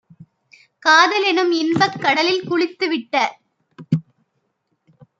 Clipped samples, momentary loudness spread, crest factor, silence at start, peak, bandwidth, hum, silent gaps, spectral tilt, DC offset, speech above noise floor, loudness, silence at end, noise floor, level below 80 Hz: under 0.1%; 11 LU; 20 dB; 0.2 s; 0 dBFS; 7.6 kHz; none; none; -4.5 dB/octave; under 0.1%; 53 dB; -17 LUFS; 1.2 s; -70 dBFS; -66 dBFS